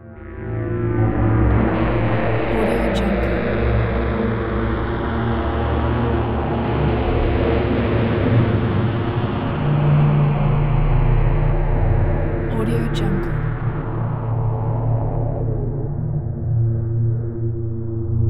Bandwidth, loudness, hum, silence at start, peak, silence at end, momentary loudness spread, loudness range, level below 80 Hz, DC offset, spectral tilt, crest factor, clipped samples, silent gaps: 5.2 kHz; -20 LUFS; none; 0 s; -4 dBFS; 0 s; 7 LU; 4 LU; -26 dBFS; under 0.1%; -9 dB/octave; 14 dB; under 0.1%; none